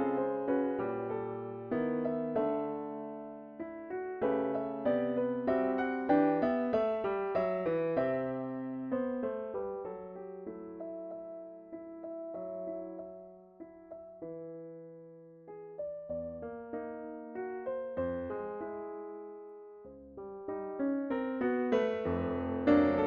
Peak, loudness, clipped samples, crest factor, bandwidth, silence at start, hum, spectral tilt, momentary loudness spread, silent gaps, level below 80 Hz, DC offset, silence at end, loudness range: -16 dBFS; -35 LUFS; under 0.1%; 20 dB; 6.6 kHz; 0 s; none; -6.5 dB/octave; 17 LU; none; -68 dBFS; under 0.1%; 0 s; 13 LU